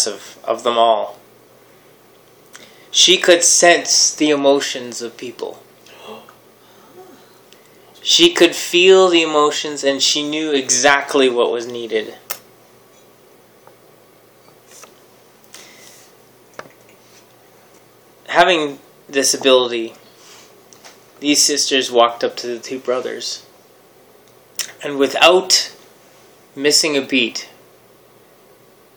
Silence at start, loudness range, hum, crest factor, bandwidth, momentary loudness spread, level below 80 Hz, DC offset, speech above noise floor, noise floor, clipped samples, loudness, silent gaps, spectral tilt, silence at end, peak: 0 s; 10 LU; none; 18 dB; over 20 kHz; 19 LU; -66 dBFS; under 0.1%; 34 dB; -49 dBFS; under 0.1%; -14 LUFS; none; -1 dB/octave; 1.5 s; 0 dBFS